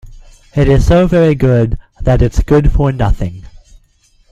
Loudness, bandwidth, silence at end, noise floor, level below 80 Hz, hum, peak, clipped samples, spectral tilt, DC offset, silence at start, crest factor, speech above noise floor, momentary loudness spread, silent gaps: -12 LUFS; 12 kHz; 0.75 s; -51 dBFS; -18 dBFS; none; 0 dBFS; under 0.1%; -8 dB/octave; under 0.1%; 0.05 s; 12 dB; 41 dB; 10 LU; none